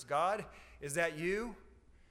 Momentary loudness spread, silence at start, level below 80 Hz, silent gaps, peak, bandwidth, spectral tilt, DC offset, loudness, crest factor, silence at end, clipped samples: 16 LU; 0 s; -60 dBFS; none; -20 dBFS; 16 kHz; -4 dB/octave; under 0.1%; -36 LUFS; 18 dB; 0.4 s; under 0.1%